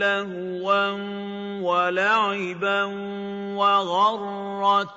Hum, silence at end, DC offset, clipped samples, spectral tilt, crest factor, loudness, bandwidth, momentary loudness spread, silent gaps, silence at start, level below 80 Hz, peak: none; 0 s; under 0.1%; under 0.1%; -5 dB/octave; 16 dB; -23 LUFS; 7.8 kHz; 11 LU; none; 0 s; -76 dBFS; -8 dBFS